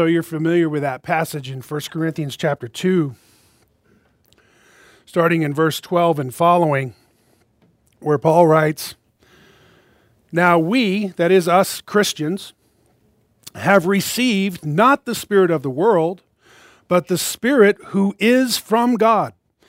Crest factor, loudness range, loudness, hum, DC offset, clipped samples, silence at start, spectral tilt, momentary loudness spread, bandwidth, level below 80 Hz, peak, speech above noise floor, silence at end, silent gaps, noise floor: 18 dB; 6 LU; -18 LUFS; none; under 0.1%; under 0.1%; 0 s; -5.5 dB/octave; 11 LU; 16 kHz; -64 dBFS; 0 dBFS; 43 dB; 0.4 s; none; -60 dBFS